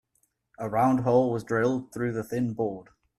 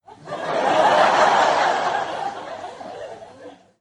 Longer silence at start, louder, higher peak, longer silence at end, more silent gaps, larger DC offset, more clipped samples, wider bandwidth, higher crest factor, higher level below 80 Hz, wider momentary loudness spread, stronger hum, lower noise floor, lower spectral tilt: first, 0.6 s vs 0.1 s; second, -27 LUFS vs -19 LUFS; second, -10 dBFS vs -4 dBFS; about the same, 0.35 s vs 0.3 s; neither; neither; neither; first, 13.5 kHz vs 11.5 kHz; about the same, 18 dB vs 16 dB; about the same, -62 dBFS vs -66 dBFS; second, 9 LU vs 20 LU; neither; first, -73 dBFS vs -43 dBFS; first, -8 dB/octave vs -3 dB/octave